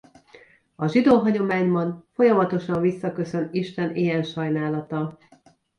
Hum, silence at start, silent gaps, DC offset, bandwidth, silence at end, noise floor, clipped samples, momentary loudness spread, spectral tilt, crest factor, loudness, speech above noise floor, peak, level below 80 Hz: none; 0.8 s; none; under 0.1%; 10 kHz; 0.65 s; -57 dBFS; under 0.1%; 10 LU; -8 dB/octave; 18 dB; -23 LUFS; 35 dB; -6 dBFS; -62 dBFS